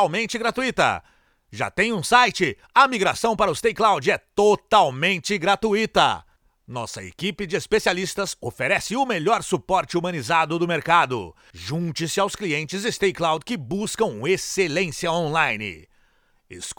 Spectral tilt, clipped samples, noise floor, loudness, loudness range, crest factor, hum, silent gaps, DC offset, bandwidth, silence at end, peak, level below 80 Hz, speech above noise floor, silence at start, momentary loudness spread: -4 dB/octave; under 0.1%; -62 dBFS; -22 LUFS; 5 LU; 20 dB; none; none; under 0.1%; 19.5 kHz; 0.05 s; -2 dBFS; -54 dBFS; 40 dB; 0 s; 11 LU